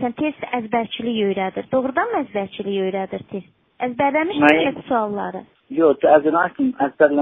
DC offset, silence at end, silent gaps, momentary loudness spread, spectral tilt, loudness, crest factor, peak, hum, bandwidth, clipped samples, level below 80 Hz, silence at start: under 0.1%; 0 s; none; 13 LU; -3.5 dB/octave; -20 LUFS; 20 dB; 0 dBFS; none; 3.9 kHz; under 0.1%; -60 dBFS; 0 s